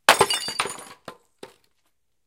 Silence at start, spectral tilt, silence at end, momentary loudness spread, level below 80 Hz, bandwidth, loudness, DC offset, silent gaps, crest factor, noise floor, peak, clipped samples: 0.1 s; -1 dB/octave; 0.8 s; 26 LU; -60 dBFS; 17 kHz; -22 LUFS; under 0.1%; none; 26 dB; -75 dBFS; 0 dBFS; under 0.1%